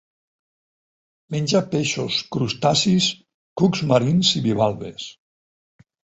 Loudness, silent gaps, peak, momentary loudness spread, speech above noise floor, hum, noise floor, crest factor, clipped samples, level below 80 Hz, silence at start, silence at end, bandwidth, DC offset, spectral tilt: -20 LUFS; 3.34-3.56 s; -2 dBFS; 16 LU; over 70 dB; none; under -90 dBFS; 20 dB; under 0.1%; -56 dBFS; 1.3 s; 1 s; 8.2 kHz; under 0.1%; -5 dB/octave